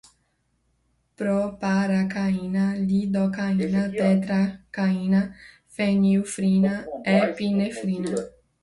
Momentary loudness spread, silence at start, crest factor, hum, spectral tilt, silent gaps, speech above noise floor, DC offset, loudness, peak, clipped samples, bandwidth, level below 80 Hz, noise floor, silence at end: 7 LU; 1.2 s; 16 dB; none; -7 dB/octave; none; 47 dB; under 0.1%; -24 LUFS; -8 dBFS; under 0.1%; 11.5 kHz; -56 dBFS; -70 dBFS; 0.35 s